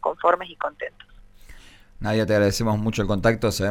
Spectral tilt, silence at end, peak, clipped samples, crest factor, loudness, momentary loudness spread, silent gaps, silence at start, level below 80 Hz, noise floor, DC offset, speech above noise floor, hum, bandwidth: -5.5 dB/octave; 0 s; -6 dBFS; under 0.1%; 18 dB; -23 LUFS; 11 LU; none; 0.05 s; -42 dBFS; -45 dBFS; under 0.1%; 23 dB; none; 17.5 kHz